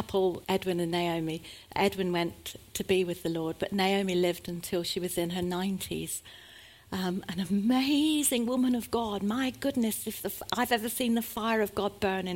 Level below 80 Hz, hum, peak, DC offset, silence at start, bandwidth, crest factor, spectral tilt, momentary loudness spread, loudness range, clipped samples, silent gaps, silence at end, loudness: -58 dBFS; none; -12 dBFS; under 0.1%; 0 s; 17 kHz; 18 dB; -4.5 dB/octave; 10 LU; 3 LU; under 0.1%; none; 0 s; -30 LUFS